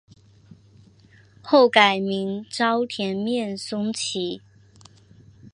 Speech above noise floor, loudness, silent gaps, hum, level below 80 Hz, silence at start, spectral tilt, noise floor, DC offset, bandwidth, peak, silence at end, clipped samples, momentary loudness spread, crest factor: 31 dB; -22 LUFS; none; none; -66 dBFS; 0.5 s; -4 dB/octave; -53 dBFS; under 0.1%; 11.5 kHz; 0 dBFS; 0.05 s; under 0.1%; 13 LU; 24 dB